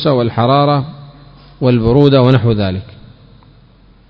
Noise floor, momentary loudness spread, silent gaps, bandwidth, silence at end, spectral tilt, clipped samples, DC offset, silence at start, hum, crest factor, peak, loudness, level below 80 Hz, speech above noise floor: -45 dBFS; 10 LU; none; 5.4 kHz; 1.25 s; -10 dB/octave; 0.4%; under 0.1%; 0 s; none; 14 dB; 0 dBFS; -12 LUFS; -36 dBFS; 34 dB